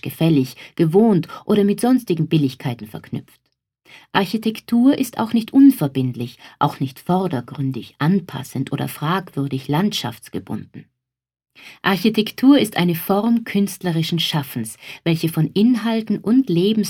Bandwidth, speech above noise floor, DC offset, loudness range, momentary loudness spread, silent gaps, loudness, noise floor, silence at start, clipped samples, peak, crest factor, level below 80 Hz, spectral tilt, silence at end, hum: 18 kHz; 65 dB; under 0.1%; 5 LU; 14 LU; none; -19 LUFS; -84 dBFS; 0.05 s; under 0.1%; 0 dBFS; 18 dB; -62 dBFS; -6.5 dB/octave; 0 s; none